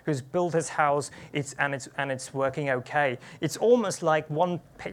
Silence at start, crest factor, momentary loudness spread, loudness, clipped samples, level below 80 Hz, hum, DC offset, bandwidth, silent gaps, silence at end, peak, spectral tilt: 0.05 s; 18 dB; 10 LU; -27 LUFS; under 0.1%; -66 dBFS; none; under 0.1%; 15.5 kHz; none; 0 s; -8 dBFS; -5 dB/octave